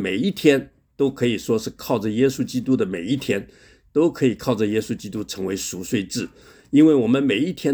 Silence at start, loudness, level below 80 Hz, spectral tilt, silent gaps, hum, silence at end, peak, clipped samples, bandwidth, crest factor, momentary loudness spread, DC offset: 0 s; -21 LUFS; -54 dBFS; -5.5 dB/octave; none; none; 0 s; -2 dBFS; under 0.1%; over 20 kHz; 18 dB; 10 LU; under 0.1%